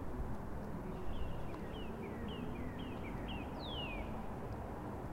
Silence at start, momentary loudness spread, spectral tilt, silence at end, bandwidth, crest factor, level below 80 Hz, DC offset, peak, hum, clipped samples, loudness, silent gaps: 0 s; 3 LU; -7 dB/octave; 0 s; 16 kHz; 14 dB; -48 dBFS; under 0.1%; -28 dBFS; none; under 0.1%; -45 LUFS; none